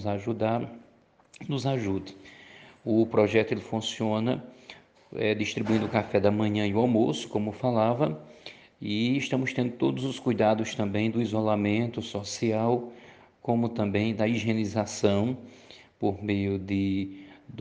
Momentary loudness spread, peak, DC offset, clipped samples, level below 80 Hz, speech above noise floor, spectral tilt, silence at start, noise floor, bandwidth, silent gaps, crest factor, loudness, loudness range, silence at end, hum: 16 LU; -8 dBFS; under 0.1%; under 0.1%; -66 dBFS; 33 dB; -6.5 dB/octave; 0 s; -60 dBFS; 9.6 kHz; none; 20 dB; -28 LUFS; 2 LU; 0 s; none